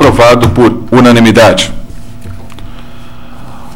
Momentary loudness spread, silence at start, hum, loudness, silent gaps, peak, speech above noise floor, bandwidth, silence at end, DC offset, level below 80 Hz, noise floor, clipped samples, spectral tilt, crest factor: 24 LU; 0 s; none; -6 LUFS; none; 0 dBFS; 24 dB; 16.5 kHz; 0 s; 8%; -26 dBFS; -30 dBFS; 1%; -5.5 dB/octave; 8 dB